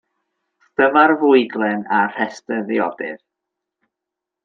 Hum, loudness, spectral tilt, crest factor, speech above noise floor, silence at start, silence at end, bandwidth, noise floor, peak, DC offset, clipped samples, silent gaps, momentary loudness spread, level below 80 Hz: none; -17 LUFS; -6 dB/octave; 18 dB; 67 dB; 0.8 s; 1.3 s; 7.6 kHz; -84 dBFS; -2 dBFS; under 0.1%; under 0.1%; none; 15 LU; -68 dBFS